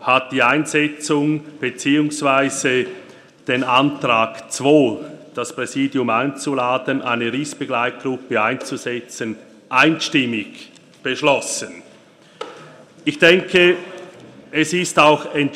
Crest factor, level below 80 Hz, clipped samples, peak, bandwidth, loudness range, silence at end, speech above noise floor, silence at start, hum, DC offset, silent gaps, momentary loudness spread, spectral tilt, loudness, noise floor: 20 dB; -62 dBFS; under 0.1%; 0 dBFS; 14 kHz; 3 LU; 0 s; 30 dB; 0 s; none; under 0.1%; none; 15 LU; -4 dB/octave; -18 LUFS; -48 dBFS